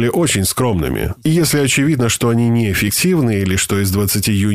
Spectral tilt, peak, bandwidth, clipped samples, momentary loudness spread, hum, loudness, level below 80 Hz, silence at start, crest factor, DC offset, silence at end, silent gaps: -4.5 dB/octave; -4 dBFS; 16 kHz; under 0.1%; 3 LU; none; -15 LUFS; -36 dBFS; 0 s; 10 dB; 0.6%; 0 s; none